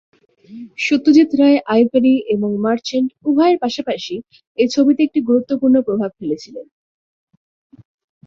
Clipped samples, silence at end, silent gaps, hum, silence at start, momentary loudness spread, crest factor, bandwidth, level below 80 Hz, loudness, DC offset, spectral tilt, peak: under 0.1%; 1.65 s; 4.47-4.55 s; none; 0.5 s; 15 LU; 16 dB; 7.6 kHz; -62 dBFS; -16 LUFS; under 0.1%; -5.5 dB/octave; -2 dBFS